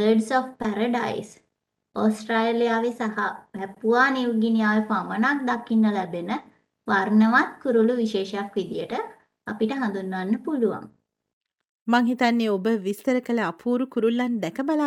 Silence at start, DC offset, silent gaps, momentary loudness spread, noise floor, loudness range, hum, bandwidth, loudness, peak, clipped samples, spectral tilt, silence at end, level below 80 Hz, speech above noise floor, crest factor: 0 s; under 0.1%; 11.33-11.41 s, 11.69-11.86 s; 11 LU; -78 dBFS; 5 LU; none; 12.5 kHz; -24 LUFS; -6 dBFS; under 0.1%; -6 dB/octave; 0 s; -68 dBFS; 55 dB; 18 dB